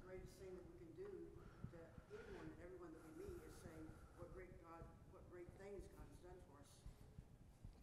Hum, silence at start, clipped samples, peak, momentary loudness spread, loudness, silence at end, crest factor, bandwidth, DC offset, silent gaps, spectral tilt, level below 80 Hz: none; 0 s; under 0.1%; -40 dBFS; 8 LU; -60 LUFS; 0 s; 20 dB; 15.5 kHz; under 0.1%; none; -6.5 dB/octave; -66 dBFS